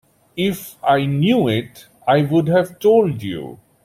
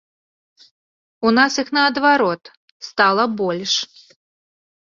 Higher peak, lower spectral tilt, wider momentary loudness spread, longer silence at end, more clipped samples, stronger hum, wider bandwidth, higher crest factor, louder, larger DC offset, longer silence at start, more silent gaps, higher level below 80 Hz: about the same, -2 dBFS vs -2 dBFS; first, -7 dB/octave vs -3 dB/octave; about the same, 14 LU vs 14 LU; second, 0.3 s vs 1 s; neither; neither; first, 16 kHz vs 7.6 kHz; about the same, 16 dB vs 20 dB; about the same, -18 LUFS vs -17 LUFS; neither; second, 0.35 s vs 1.2 s; second, none vs 2.57-2.80 s; first, -54 dBFS vs -64 dBFS